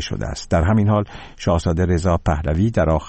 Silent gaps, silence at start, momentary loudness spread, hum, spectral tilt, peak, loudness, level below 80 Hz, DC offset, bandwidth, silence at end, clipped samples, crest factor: none; 0 s; 9 LU; none; -7 dB/octave; -6 dBFS; -19 LUFS; -30 dBFS; under 0.1%; 8.6 kHz; 0 s; under 0.1%; 12 dB